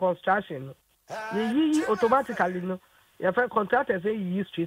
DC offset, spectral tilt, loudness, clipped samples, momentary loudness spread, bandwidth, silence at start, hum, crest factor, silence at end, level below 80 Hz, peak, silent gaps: under 0.1%; -6 dB/octave; -26 LUFS; under 0.1%; 14 LU; 16 kHz; 0 s; none; 16 dB; 0 s; -66 dBFS; -10 dBFS; none